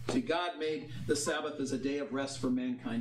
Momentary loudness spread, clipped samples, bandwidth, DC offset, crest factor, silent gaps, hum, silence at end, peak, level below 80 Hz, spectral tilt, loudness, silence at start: 5 LU; under 0.1%; 13.5 kHz; 0.2%; 16 dB; none; none; 0 s; -18 dBFS; -64 dBFS; -4.5 dB/octave; -34 LUFS; 0 s